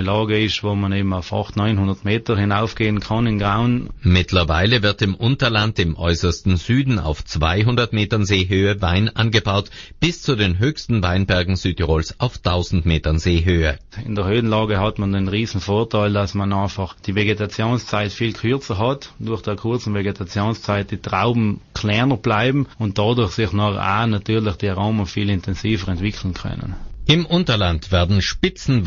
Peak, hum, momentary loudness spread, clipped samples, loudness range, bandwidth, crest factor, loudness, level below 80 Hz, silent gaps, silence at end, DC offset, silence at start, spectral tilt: -2 dBFS; none; 6 LU; under 0.1%; 4 LU; 7.4 kHz; 16 dB; -19 LUFS; -34 dBFS; none; 0 s; under 0.1%; 0 s; -5 dB/octave